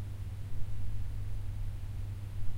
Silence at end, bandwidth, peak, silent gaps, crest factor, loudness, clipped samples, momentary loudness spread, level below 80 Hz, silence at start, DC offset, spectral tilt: 0 s; 11 kHz; -20 dBFS; none; 12 dB; -42 LUFS; under 0.1%; 1 LU; -40 dBFS; 0 s; under 0.1%; -7 dB/octave